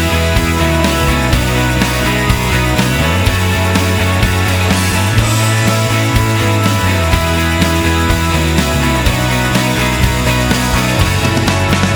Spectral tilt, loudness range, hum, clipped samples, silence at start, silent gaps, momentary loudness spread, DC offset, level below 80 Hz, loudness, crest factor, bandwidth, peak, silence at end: -4.5 dB/octave; 0 LU; none; under 0.1%; 0 s; none; 1 LU; under 0.1%; -22 dBFS; -12 LUFS; 12 dB; over 20 kHz; 0 dBFS; 0 s